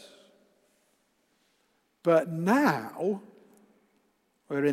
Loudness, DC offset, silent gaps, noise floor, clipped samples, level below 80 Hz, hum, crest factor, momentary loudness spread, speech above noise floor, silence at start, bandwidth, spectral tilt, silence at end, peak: -27 LUFS; under 0.1%; none; -72 dBFS; under 0.1%; -82 dBFS; none; 20 dB; 9 LU; 46 dB; 2.05 s; 16 kHz; -6.5 dB/octave; 0 s; -10 dBFS